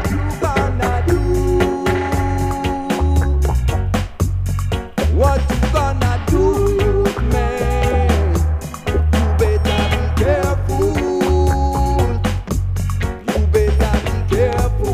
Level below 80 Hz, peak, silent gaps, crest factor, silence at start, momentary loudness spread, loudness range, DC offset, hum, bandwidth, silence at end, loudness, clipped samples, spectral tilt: -20 dBFS; 0 dBFS; none; 14 dB; 0 s; 5 LU; 2 LU; under 0.1%; none; 15.5 kHz; 0 s; -17 LUFS; under 0.1%; -6.5 dB/octave